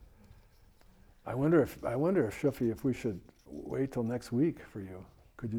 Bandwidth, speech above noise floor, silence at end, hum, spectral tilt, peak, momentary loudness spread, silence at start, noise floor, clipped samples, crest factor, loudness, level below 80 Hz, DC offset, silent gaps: 18 kHz; 29 dB; 0 s; none; -8 dB/octave; -14 dBFS; 18 LU; 0 s; -60 dBFS; under 0.1%; 20 dB; -32 LUFS; -58 dBFS; under 0.1%; none